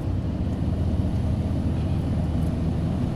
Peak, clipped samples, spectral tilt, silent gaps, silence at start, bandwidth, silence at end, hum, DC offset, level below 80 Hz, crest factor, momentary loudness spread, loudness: -12 dBFS; under 0.1%; -9 dB/octave; none; 0 s; 11.5 kHz; 0 s; none; under 0.1%; -30 dBFS; 12 dB; 2 LU; -26 LUFS